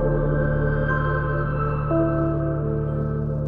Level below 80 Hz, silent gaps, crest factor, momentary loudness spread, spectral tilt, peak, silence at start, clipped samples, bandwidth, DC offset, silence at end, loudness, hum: -30 dBFS; none; 12 dB; 3 LU; -11.5 dB/octave; -10 dBFS; 0 s; under 0.1%; 3.4 kHz; under 0.1%; 0 s; -23 LUFS; none